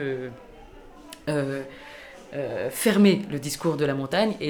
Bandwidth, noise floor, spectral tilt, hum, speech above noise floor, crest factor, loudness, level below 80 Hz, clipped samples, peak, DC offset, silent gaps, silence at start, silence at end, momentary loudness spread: over 20 kHz; -46 dBFS; -5.5 dB/octave; none; 21 dB; 18 dB; -25 LUFS; -56 dBFS; under 0.1%; -8 dBFS; under 0.1%; none; 0 s; 0 s; 23 LU